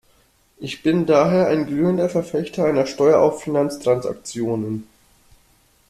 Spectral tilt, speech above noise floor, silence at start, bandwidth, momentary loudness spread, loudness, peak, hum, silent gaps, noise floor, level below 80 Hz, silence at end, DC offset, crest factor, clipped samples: -6.5 dB/octave; 40 dB; 0.6 s; 14 kHz; 12 LU; -19 LUFS; -2 dBFS; none; none; -58 dBFS; -56 dBFS; 1.05 s; under 0.1%; 18 dB; under 0.1%